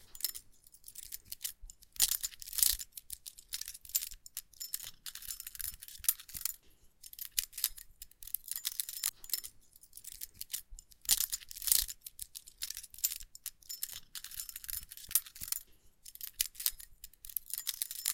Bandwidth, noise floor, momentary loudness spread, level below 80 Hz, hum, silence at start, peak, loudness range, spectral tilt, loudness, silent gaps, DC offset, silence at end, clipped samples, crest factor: 17 kHz; -60 dBFS; 20 LU; -60 dBFS; none; 0 s; -2 dBFS; 5 LU; 2.5 dB/octave; -36 LUFS; none; under 0.1%; 0 s; under 0.1%; 38 dB